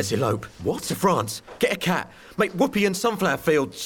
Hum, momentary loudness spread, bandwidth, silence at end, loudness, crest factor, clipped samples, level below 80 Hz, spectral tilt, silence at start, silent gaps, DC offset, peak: none; 6 LU; 19.5 kHz; 0 s; -24 LUFS; 14 dB; under 0.1%; -56 dBFS; -4.5 dB/octave; 0 s; none; under 0.1%; -10 dBFS